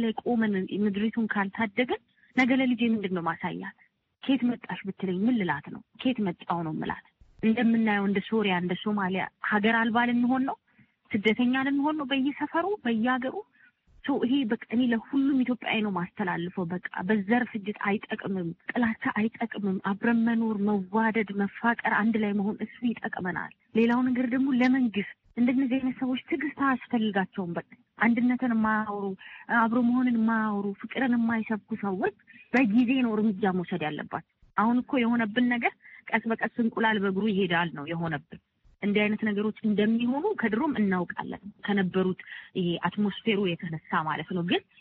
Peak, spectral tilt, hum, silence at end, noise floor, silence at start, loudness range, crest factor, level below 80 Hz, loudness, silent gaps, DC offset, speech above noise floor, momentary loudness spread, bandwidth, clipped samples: -10 dBFS; -4.5 dB/octave; none; 0.2 s; -60 dBFS; 0 s; 3 LU; 18 dB; -66 dBFS; -27 LUFS; none; under 0.1%; 33 dB; 9 LU; 5.6 kHz; under 0.1%